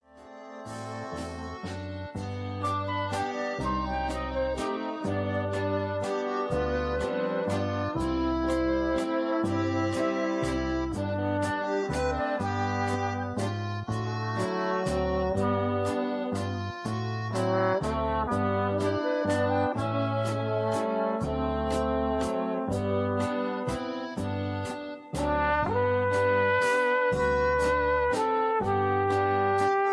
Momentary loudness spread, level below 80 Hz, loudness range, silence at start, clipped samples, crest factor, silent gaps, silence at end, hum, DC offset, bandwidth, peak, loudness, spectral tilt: 8 LU; -44 dBFS; 5 LU; 0.15 s; under 0.1%; 14 dB; none; 0 s; none; under 0.1%; 11 kHz; -14 dBFS; -28 LUFS; -6.5 dB/octave